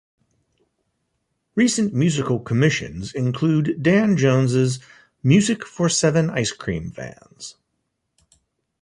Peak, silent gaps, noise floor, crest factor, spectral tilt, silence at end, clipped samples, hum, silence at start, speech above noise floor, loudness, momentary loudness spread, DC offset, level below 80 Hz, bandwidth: -4 dBFS; none; -75 dBFS; 18 dB; -5.5 dB/octave; 1.3 s; under 0.1%; none; 1.55 s; 55 dB; -20 LUFS; 16 LU; under 0.1%; -52 dBFS; 11.5 kHz